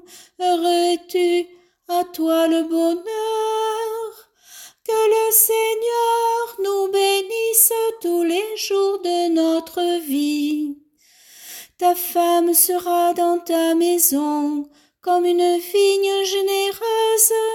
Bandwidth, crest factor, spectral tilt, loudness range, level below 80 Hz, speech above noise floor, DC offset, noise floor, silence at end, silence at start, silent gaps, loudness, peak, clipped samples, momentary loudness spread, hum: 17 kHz; 20 dB; -0.5 dB/octave; 4 LU; -70 dBFS; 36 dB; under 0.1%; -54 dBFS; 0 s; 0.1 s; none; -18 LUFS; 0 dBFS; under 0.1%; 10 LU; none